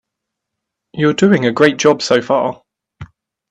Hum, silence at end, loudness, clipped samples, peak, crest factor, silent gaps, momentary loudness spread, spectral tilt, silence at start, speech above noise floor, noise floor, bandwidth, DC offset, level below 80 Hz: none; 0.45 s; -14 LUFS; under 0.1%; 0 dBFS; 16 dB; none; 7 LU; -5 dB/octave; 0.95 s; 66 dB; -79 dBFS; 9.6 kHz; under 0.1%; -54 dBFS